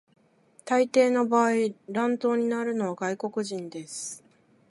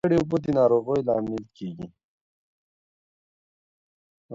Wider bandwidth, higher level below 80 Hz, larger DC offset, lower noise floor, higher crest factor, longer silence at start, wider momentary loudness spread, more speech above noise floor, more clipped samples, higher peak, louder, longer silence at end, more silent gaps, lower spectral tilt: first, 11.5 kHz vs 7.6 kHz; second, -80 dBFS vs -58 dBFS; neither; second, -60 dBFS vs under -90 dBFS; about the same, 18 dB vs 18 dB; first, 0.65 s vs 0.05 s; second, 14 LU vs 17 LU; second, 34 dB vs over 66 dB; neither; about the same, -8 dBFS vs -8 dBFS; about the same, -26 LUFS vs -24 LUFS; first, 0.55 s vs 0 s; second, none vs 2.04-4.29 s; second, -4.5 dB/octave vs -8.5 dB/octave